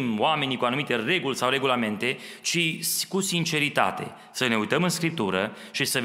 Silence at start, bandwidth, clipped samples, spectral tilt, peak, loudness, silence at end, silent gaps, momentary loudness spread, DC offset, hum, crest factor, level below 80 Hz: 0 s; 16 kHz; under 0.1%; -3.5 dB/octave; -4 dBFS; -25 LUFS; 0 s; none; 5 LU; under 0.1%; none; 20 dB; -70 dBFS